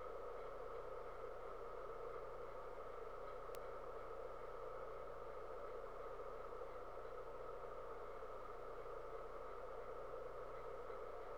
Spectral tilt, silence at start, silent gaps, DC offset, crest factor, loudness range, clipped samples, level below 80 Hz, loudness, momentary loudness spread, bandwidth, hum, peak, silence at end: -5.5 dB/octave; 0 s; none; 0.2%; 20 dB; 0 LU; under 0.1%; -64 dBFS; -52 LUFS; 1 LU; 19.5 kHz; 60 Hz at -70 dBFS; -32 dBFS; 0 s